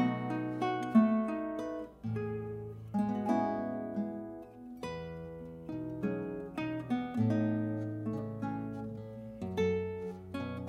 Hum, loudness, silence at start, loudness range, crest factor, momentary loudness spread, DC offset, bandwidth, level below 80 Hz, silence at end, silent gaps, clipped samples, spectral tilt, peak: none; -35 LUFS; 0 s; 6 LU; 20 dB; 13 LU; under 0.1%; 9 kHz; -64 dBFS; 0 s; none; under 0.1%; -8.5 dB/octave; -16 dBFS